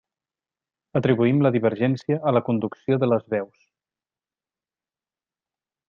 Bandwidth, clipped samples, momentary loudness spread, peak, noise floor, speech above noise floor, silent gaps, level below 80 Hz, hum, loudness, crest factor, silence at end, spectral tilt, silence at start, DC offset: 7 kHz; under 0.1%; 9 LU; -6 dBFS; under -90 dBFS; over 69 dB; none; -66 dBFS; none; -22 LUFS; 18 dB; 2.45 s; -9.5 dB/octave; 0.95 s; under 0.1%